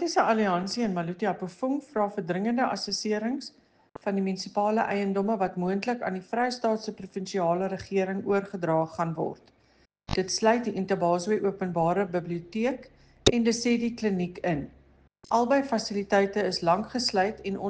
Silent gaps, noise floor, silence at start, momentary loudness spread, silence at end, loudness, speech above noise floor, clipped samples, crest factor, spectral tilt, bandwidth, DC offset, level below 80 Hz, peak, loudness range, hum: none; -64 dBFS; 0 s; 8 LU; 0 s; -28 LUFS; 37 dB; under 0.1%; 24 dB; -5 dB/octave; 9.8 kHz; under 0.1%; -54 dBFS; -4 dBFS; 2 LU; none